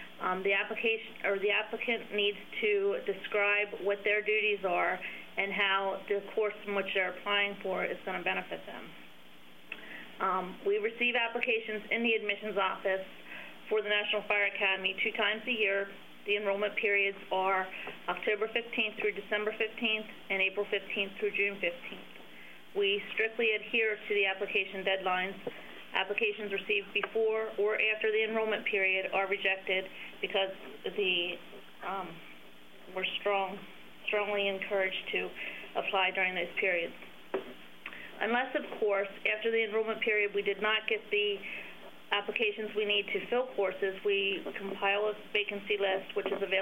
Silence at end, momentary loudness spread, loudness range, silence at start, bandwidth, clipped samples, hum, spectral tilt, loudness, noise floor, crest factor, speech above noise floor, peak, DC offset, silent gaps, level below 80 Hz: 0 s; 13 LU; 4 LU; 0 s; 16 kHz; under 0.1%; none; -4.5 dB/octave; -31 LUFS; -57 dBFS; 20 dB; 24 dB; -12 dBFS; 0.2%; none; -76 dBFS